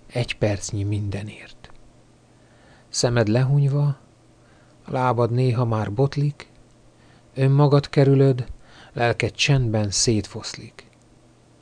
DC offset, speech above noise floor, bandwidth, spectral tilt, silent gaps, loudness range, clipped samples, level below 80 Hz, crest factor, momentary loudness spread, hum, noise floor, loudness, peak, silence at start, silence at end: under 0.1%; 33 dB; 10 kHz; -5.5 dB/octave; none; 5 LU; under 0.1%; -48 dBFS; 16 dB; 16 LU; none; -54 dBFS; -21 LUFS; -6 dBFS; 0.15 s; 0.95 s